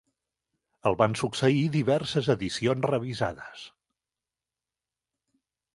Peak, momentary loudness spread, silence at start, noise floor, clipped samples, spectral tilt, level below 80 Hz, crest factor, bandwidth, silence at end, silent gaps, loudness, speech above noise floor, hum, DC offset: -6 dBFS; 8 LU; 0.85 s; under -90 dBFS; under 0.1%; -6 dB/octave; -60 dBFS; 22 dB; 11.5 kHz; 2.1 s; none; -27 LUFS; over 64 dB; none; under 0.1%